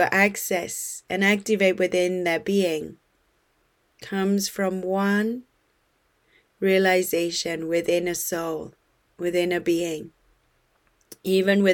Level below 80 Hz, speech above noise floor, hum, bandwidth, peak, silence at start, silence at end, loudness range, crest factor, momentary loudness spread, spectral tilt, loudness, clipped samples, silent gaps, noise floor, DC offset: -64 dBFS; 44 dB; none; 19 kHz; -6 dBFS; 0 s; 0 s; 4 LU; 20 dB; 11 LU; -4.5 dB/octave; -24 LUFS; under 0.1%; none; -67 dBFS; under 0.1%